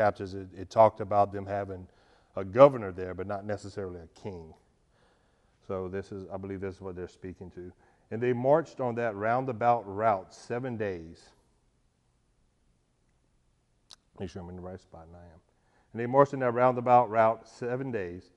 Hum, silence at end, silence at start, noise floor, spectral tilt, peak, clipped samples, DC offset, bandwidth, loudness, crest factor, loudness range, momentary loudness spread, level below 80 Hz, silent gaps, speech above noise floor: none; 0.15 s; 0 s; -71 dBFS; -7.5 dB/octave; -4 dBFS; under 0.1%; under 0.1%; 9.6 kHz; -28 LUFS; 26 dB; 20 LU; 20 LU; -64 dBFS; none; 42 dB